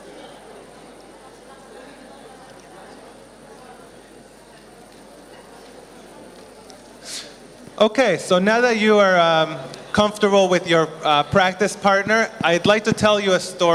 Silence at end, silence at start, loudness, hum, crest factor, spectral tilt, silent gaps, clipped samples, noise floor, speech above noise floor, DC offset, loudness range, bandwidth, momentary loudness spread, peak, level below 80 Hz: 0 s; 0.05 s; -17 LUFS; none; 18 dB; -4 dB/octave; none; under 0.1%; -45 dBFS; 28 dB; under 0.1%; 16 LU; 13 kHz; 18 LU; -4 dBFS; -56 dBFS